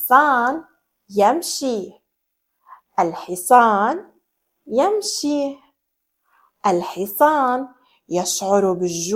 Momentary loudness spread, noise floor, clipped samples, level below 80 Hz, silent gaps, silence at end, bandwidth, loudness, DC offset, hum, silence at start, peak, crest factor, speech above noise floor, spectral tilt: 13 LU; -75 dBFS; under 0.1%; -66 dBFS; none; 0 s; 17 kHz; -19 LUFS; under 0.1%; none; 0 s; 0 dBFS; 20 dB; 57 dB; -3.5 dB/octave